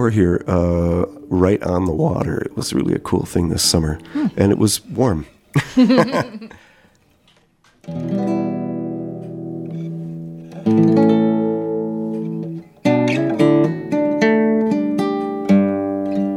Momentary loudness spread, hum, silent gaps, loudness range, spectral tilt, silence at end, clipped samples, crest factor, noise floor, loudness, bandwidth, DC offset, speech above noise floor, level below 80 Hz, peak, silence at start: 13 LU; none; none; 8 LU; -6 dB/octave; 0 s; under 0.1%; 18 dB; -56 dBFS; -18 LUFS; 16 kHz; under 0.1%; 39 dB; -42 dBFS; 0 dBFS; 0 s